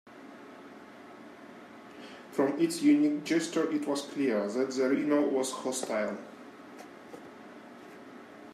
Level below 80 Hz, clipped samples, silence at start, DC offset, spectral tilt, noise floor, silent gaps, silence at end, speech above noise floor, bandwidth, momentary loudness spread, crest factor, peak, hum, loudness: -84 dBFS; under 0.1%; 0.05 s; under 0.1%; -4.5 dB/octave; -49 dBFS; none; 0 s; 21 dB; 14 kHz; 22 LU; 18 dB; -14 dBFS; none; -29 LUFS